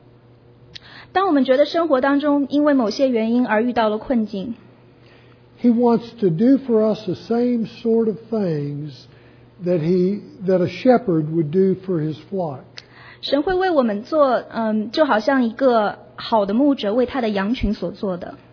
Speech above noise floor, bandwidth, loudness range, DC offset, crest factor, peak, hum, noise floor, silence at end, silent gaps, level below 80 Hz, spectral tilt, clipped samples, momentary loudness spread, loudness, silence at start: 30 dB; 5.4 kHz; 3 LU; under 0.1%; 16 dB; -2 dBFS; none; -49 dBFS; 0.15 s; none; -46 dBFS; -7.5 dB/octave; under 0.1%; 11 LU; -19 LUFS; 0.9 s